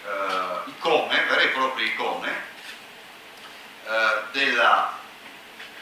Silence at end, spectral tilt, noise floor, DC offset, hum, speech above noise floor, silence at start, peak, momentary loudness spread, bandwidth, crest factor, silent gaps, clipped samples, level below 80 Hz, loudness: 0 s; -2 dB/octave; -44 dBFS; under 0.1%; none; 21 dB; 0 s; -6 dBFS; 22 LU; 16 kHz; 20 dB; none; under 0.1%; -74 dBFS; -22 LUFS